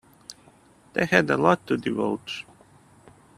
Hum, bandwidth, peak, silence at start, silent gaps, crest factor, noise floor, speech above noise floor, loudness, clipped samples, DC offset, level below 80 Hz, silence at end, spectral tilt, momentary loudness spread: none; 14.5 kHz; 0 dBFS; 0.3 s; none; 26 dB; -55 dBFS; 32 dB; -24 LUFS; under 0.1%; under 0.1%; -62 dBFS; 0.95 s; -5.5 dB/octave; 24 LU